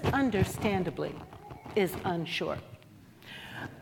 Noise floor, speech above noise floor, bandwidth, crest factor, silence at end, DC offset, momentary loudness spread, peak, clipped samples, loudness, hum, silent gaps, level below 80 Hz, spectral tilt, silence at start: -54 dBFS; 24 dB; 18 kHz; 18 dB; 0 s; under 0.1%; 19 LU; -14 dBFS; under 0.1%; -32 LUFS; none; none; -54 dBFS; -6 dB/octave; 0 s